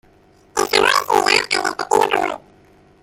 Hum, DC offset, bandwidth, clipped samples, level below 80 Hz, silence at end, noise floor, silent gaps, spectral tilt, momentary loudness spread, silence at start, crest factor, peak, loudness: none; under 0.1%; 17 kHz; under 0.1%; -54 dBFS; 0.65 s; -52 dBFS; none; -1.5 dB/octave; 10 LU; 0.55 s; 18 dB; 0 dBFS; -17 LUFS